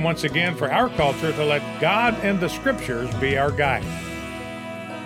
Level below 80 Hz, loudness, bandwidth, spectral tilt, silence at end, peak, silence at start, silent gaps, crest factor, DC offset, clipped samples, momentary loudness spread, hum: -44 dBFS; -22 LUFS; 16.5 kHz; -5.5 dB/octave; 0 s; -6 dBFS; 0 s; none; 16 dB; under 0.1%; under 0.1%; 12 LU; none